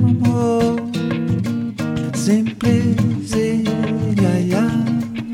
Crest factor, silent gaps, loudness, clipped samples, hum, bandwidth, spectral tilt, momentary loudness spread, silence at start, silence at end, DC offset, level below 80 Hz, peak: 14 dB; none; -18 LUFS; under 0.1%; none; 14.5 kHz; -7 dB/octave; 6 LU; 0 s; 0 s; under 0.1%; -44 dBFS; -2 dBFS